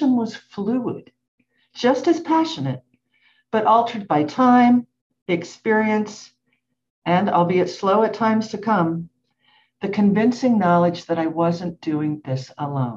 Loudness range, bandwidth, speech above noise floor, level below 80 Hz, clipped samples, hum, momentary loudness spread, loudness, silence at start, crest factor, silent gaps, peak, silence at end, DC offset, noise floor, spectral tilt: 3 LU; 7.6 kHz; 52 dB; -66 dBFS; under 0.1%; none; 12 LU; -20 LUFS; 0 s; 16 dB; 1.28-1.38 s, 5.01-5.10 s, 5.22-5.26 s, 6.90-7.02 s; -4 dBFS; 0 s; under 0.1%; -71 dBFS; -7 dB/octave